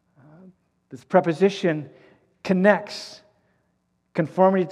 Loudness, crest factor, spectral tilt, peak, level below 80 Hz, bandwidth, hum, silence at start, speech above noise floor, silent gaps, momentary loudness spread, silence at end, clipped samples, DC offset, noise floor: -22 LUFS; 22 dB; -7 dB/octave; -2 dBFS; -74 dBFS; 10.5 kHz; none; 0.9 s; 49 dB; none; 17 LU; 0 s; under 0.1%; under 0.1%; -71 dBFS